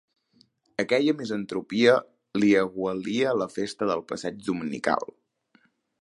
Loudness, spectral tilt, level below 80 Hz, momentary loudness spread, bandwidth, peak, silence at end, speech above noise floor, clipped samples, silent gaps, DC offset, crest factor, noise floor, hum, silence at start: -26 LUFS; -5.5 dB/octave; -68 dBFS; 11 LU; 11.5 kHz; -6 dBFS; 0.95 s; 40 dB; under 0.1%; none; under 0.1%; 20 dB; -65 dBFS; none; 0.8 s